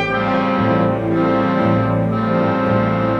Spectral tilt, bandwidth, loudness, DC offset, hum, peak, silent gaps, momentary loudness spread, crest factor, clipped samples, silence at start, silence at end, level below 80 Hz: -9 dB/octave; 6.8 kHz; -17 LUFS; under 0.1%; none; -4 dBFS; none; 2 LU; 12 dB; under 0.1%; 0 s; 0 s; -42 dBFS